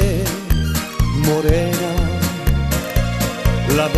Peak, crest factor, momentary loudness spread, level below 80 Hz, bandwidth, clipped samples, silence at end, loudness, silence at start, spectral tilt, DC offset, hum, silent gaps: -2 dBFS; 16 dB; 4 LU; -22 dBFS; 14 kHz; under 0.1%; 0 s; -19 LUFS; 0 s; -5.5 dB/octave; under 0.1%; none; none